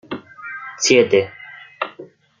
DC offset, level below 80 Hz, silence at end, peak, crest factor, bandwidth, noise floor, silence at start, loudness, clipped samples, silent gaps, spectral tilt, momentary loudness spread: under 0.1%; -66 dBFS; 0.35 s; -2 dBFS; 18 dB; 9.4 kHz; -42 dBFS; 0.1 s; -17 LUFS; under 0.1%; none; -3 dB/octave; 20 LU